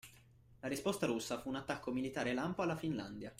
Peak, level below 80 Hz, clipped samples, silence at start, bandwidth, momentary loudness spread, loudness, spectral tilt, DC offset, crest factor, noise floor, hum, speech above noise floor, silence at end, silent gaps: -22 dBFS; -66 dBFS; under 0.1%; 0.05 s; 16 kHz; 6 LU; -40 LUFS; -5 dB/octave; under 0.1%; 20 dB; -64 dBFS; none; 25 dB; 0 s; none